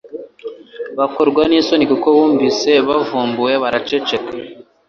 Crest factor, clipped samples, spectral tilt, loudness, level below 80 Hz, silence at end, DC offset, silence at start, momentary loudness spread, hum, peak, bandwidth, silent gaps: 14 dB; under 0.1%; -4.5 dB/octave; -15 LUFS; -52 dBFS; 0.25 s; under 0.1%; 0.05 s; 19 LU; none; -2 dBFS; 7.2 kHz; none